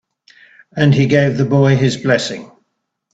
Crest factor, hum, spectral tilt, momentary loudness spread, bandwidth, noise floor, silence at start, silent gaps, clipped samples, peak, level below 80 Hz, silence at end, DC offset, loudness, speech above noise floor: 16 dB; none; -6.5 dB/octave; 13 LU; 8 kHz; -71 dBFS; 0.75 s; none; under 0.1%; 0 dBFS; -50 dBFS; 0.7 s; under 0.1%; -14 LUFS; 58 dB